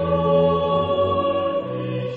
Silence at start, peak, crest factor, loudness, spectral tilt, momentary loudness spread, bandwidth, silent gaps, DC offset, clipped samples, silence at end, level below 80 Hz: 0 s; -6 dBFS; 14 dB; -20 LUFS; -9 dB/octave; 8 LU; 4.8 kHz; none; under 0.1%; under 0.1%; 0 s; -46 dBFS